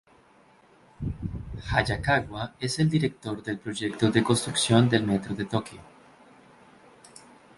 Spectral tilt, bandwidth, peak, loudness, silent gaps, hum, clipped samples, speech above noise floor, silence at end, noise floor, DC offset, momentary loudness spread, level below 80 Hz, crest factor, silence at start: -5 dB/octave; 11.5 kHz; -6 dBFS; -26 LUFS; none; none; under 0.1%; 32 dB; 1.75 s; -58 dBFS; under 0.1%; 14 LU; -48 dBFS; 22 dB; 1 s